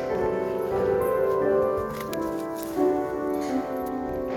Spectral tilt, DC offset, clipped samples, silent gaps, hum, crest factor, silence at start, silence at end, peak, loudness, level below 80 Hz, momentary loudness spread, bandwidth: -6.5 dB/octave; under 0.1%; under 0.1%; none; none; 14 dB; 0 s; 0 s; -12 dBFS; -26 LUFS; -50 dBFS; 7 LU; 17 kHz